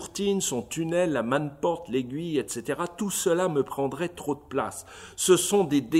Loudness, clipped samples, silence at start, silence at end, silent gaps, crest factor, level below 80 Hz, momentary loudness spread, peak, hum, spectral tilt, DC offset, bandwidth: -27 LUFS; under 0.1%; 0 s; 0 s; none; 18 dB; -60 dBFS; 9 LU; -8 dBFS; none; -4 dB/octave; under 0.1%; 16 kHz